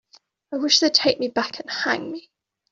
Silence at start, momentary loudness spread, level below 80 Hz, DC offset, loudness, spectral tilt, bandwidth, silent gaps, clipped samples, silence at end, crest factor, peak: 0.5 s; 17 LU; -66 dBFS; under 0.1%; -20 LUFS; -1.5 dB/octave; 7.8 kHz; none; under 0.1%; 0.5 s; 22 dB; -2 dBFS